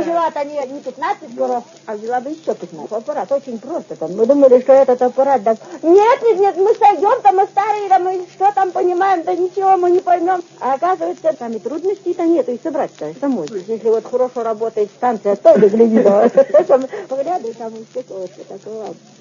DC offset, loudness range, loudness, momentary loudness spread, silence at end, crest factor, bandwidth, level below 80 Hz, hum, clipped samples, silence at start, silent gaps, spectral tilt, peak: under 0.1%; 7 LU; -15 LUFS; 16 LU; 0.25 s; 16 dB; 7.4 kHz; -72 dBFS; none; under 0.1%; 0 s; none; -6.5 dB/octave; 0 dBFS